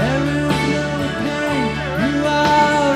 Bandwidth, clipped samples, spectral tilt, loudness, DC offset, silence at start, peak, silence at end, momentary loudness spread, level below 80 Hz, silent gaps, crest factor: 15 kHz; under 0.1%; -5.5 dB/octave; -18 LUFS; under 0.1%; 0 s; -4 dBFS; 0 s; 7 LU; -38 dBFS; none; 14 dB